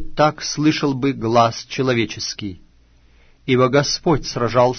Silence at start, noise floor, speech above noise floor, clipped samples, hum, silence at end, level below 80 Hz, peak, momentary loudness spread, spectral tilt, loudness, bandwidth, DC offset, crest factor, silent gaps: 0 s; -52 dBFS; 34 dB; under 0.1%; none; 0 s; -40 dBFS; -2 dBFS; 9 LU; -5 dB/octave; -18 LUFS; 6.6 kHz; under 0.1%; 16 dB; none